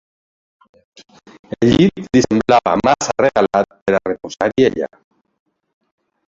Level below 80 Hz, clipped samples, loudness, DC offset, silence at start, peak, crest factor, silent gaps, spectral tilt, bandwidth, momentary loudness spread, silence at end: -46 dBFS; under 0.1%; -15 LUFS; under 0.1%; 1.6 s; 0 dBFS; 16 dB; 3.82-3.86 s; -5.5 dB/octave; 7.8 kHz; 9 LU; 1.45 s